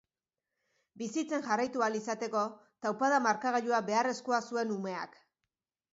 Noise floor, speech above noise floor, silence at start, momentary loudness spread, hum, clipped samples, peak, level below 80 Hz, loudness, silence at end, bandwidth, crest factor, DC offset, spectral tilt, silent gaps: under -90 dBFS; over 58 dB; 0.95 s; 10 LU; none; under 0.1%; -16 dBFS; -82 dBFS; -32 LUFS; 0.85 s; 7.6 kHz; 18 dB; under 0.1%; -3 dB/octave; none